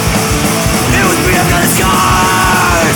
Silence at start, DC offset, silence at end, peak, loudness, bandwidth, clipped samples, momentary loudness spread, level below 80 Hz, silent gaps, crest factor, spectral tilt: 0 s; under 0.1%; 0 s; 0 dBFS; -9 LUFS; over 20 kHz; under 0.1%; 3 LU; -22 dBFS; none; 10 dB; -3.5 dB/octave